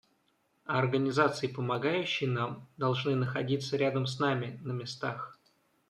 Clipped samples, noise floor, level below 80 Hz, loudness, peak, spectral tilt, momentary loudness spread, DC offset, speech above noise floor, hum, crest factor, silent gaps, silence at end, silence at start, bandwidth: under 0.1%; -73 dBFS; -74 dBFS; -31 LUFS; -12 dBFS; -6 dB/octave; 9 LU; under 0.1%; 42 dB; none; 20 dB; none; 0.55 s; 0.65 s; 10 kHz